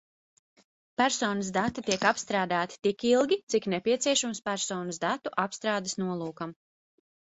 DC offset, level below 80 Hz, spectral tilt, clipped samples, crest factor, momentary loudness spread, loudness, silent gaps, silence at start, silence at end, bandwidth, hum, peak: under 0.1%; -66 dBFS; -3.5 dB/octave; under 0.1%; 22 dB; 7 LU; -28 LUFS; 3.43-3.47 s; 1 s; 0.7 s; 8.4 kHz; none; -8 dBFS